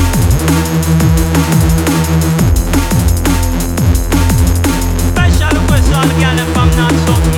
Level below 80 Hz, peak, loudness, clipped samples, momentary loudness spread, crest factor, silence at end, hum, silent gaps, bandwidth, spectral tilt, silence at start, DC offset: -16 dBFS; 0 dBFS; -11 LUFS; under 0.1%; 2 LU; 10 dB; 0 s; none; none; 19.5 kHz; -5.5 dB/octave; 0 s; under 0.1%